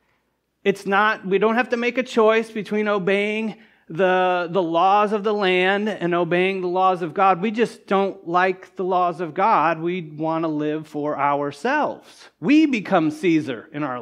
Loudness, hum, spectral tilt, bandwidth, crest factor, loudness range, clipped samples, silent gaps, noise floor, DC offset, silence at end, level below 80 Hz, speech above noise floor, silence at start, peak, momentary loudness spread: -21 LUFS; none; -6 dB/octave; 11.5 kHz; 18 dB; 3 LU; under 0.1%; none; -70 dBFS; under 0.1%; 0 s; -74 dBFS; 49 dB; 0.65 s; -4 dBFS; 9 LU